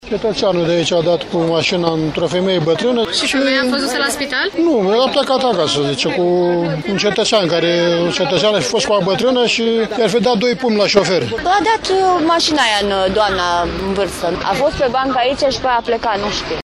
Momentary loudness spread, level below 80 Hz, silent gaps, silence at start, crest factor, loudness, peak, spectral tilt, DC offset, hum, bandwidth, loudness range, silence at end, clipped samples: 4 LU; -42 dBFS; none; 0.05 s; 14 dB; -15 LUFS; 0 dBFS; -4 dB/octave; under 0.1%; none; 14.5 kHz; 2 LU; 0 s; under 0.1%